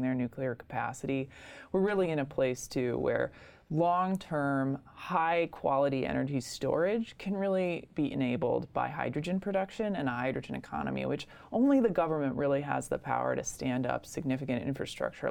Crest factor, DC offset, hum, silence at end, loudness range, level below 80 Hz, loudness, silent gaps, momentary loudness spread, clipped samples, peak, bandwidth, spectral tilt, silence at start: 16 dB; under 0.1%; none; 0 s; 2 LU; -60 dBFS; -32 LUFS; none; 7 LU; under 0.1%; -14 dBFS; 16.5 kHz; -6 dB/octave; 0 s